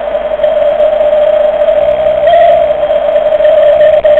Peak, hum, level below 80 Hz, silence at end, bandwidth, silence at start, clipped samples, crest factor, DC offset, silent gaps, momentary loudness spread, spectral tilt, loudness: 0 dBFS; none; -36 dBFS; 0 s; 4.1 kHz; 0 s; under 0.1%; 8 dB; under 0.1%; none; 4 LU; -6 dB/octave; -8 LUFS